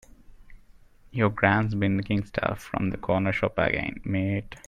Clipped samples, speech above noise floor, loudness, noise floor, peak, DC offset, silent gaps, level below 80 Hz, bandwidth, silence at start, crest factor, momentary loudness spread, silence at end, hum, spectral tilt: under 0.1%; 27 dB; -26 LUFS; -53 dBFS; -6 dBFS; under 0.1%; none; -48 dBFS; 13 kHz; 0.3 s; 22 dB; 7 LU; 0.1 s; none; -7.5 dB/octave